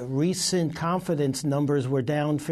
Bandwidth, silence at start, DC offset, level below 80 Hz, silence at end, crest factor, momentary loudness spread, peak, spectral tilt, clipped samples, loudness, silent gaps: 13.5 kHz; 0 s; under 0.1%; -60 dBFS; 0 s; 12 dB; 2 LU; -14 dBFS; -5.5 dB/octave; under 0.1%; -26 LUFS; none